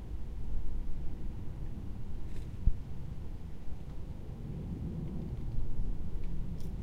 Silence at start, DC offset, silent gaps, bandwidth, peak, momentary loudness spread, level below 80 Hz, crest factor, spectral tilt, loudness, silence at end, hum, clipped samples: 0 s; under 0.1%; none; 3.8 kHz; -12 dBFS; 8 LU; -38 dBFS; 20 dB; -8.5 dB/octave; -42 LUFS; 0 s; none; under 0.1%